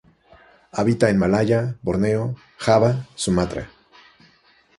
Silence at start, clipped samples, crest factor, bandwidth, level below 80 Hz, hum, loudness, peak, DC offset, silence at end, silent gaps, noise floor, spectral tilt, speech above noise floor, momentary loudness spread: 0.75 s; under 0.1%; 20 dB; 11.5 kHz; -46 dBFS; none; -21 LUFS; -2 dBFS; under 0.1%; 1.1 s; none; -57 dBFS; -6.5 dB/octave; 37 dB; 12 LU